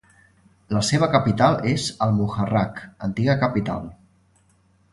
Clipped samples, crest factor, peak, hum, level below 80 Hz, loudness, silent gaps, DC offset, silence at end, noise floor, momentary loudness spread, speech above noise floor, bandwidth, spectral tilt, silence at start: under 0.1%; 20 dB; -2 dBFS; none; -48 dBFS; -22 LUFS; none; under 0.1%; 1 s; -60 dBFS; 11 LU; 39 dB; 11.5 kHz; -6 dB/octave; 0.7 s